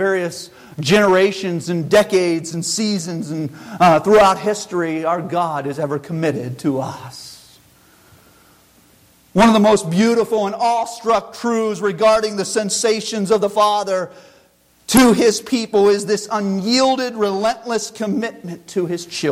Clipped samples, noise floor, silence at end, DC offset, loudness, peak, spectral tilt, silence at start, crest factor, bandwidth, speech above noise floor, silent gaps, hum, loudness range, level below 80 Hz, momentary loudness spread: under 0.1%; -54 dBFS; 0 s; under 0.1%; -17 LUFS; -2 dBFS; -4.5 dB/octave; 0 s; 16 dB; 16 kHz; 37 dB; none; none; 6 LU; -50 dBFS; 12 LU